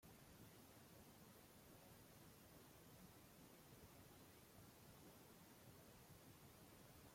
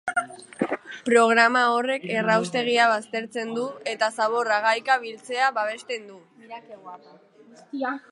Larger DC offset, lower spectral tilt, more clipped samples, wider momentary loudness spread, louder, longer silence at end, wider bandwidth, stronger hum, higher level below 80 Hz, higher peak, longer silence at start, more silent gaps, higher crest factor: neither; about the same, -4 dB/octave vs -3.5 dB/octave; neither; second, 1 LU vs 21 LU; second, -65 LUFS vs -23 LUFS; about the same, 0 s vs 0.1 s; first, 16.5 kHz vs 11.5 kHz; neither; about the same, -80 dBFS vs -78 dBFS; second, -52 dBFS vs -4 dBFS; about the same, 0 s vs 0.05 s; neither; second, 14 dB vs 20 dB